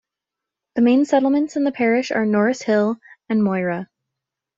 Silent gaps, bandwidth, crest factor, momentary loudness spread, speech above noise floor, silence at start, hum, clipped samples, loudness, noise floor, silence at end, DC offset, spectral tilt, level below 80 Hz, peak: none; 7.8 kHz; 16 dB; 11 LU; 67 dB; 0.75 s; none; under 0.1%; -19 LUFS; -85 dBFS; 0.75 s; under 0.1%; -6.5 dB/octave; -66 dBFS; -4 dBFS